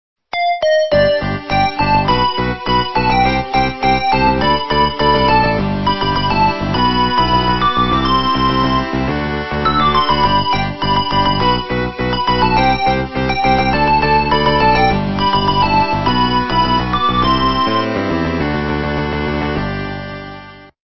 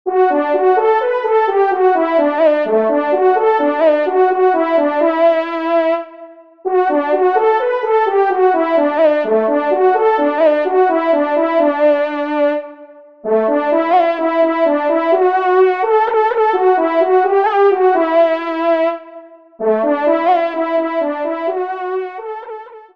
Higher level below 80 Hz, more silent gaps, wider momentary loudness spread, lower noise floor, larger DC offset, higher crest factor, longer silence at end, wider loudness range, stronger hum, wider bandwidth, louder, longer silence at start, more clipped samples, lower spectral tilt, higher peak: first, -30 dBFS vs -68 dBFS; neither; about the same, 6 LU vs 7 LU; second, -35 dBFS vs -39 dBFS; second, under 0.1% vs 0.3%; about the same, 14 dB vs 12 dB; about the same, 0.1 s vs 0.15 s; about the same, 2 LU vs 2 LU; neither; about the same, 6 kHz vs 5.6 kHz; about the same, -15 LUFS vs -14 LUFS; about the same, 0.15 s vs 0.05 s; neither; about the same, -7 dB/octave vs -6.5 dB/octave; about the same, 0 dBFS vs -2 dBFS